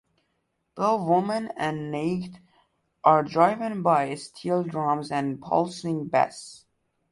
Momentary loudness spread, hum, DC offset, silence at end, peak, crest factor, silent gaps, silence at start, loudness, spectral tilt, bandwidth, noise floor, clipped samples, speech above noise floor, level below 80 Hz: 10 LU; none; under 0.1%; 0.55 s; -4 dBFS; 22 dB; none; 0.75 s; -25 LUFS; -6.5 dB/octave; 11.5 kHz; -75 dBFS; under 0.1%; 51 dB; -66 dBFS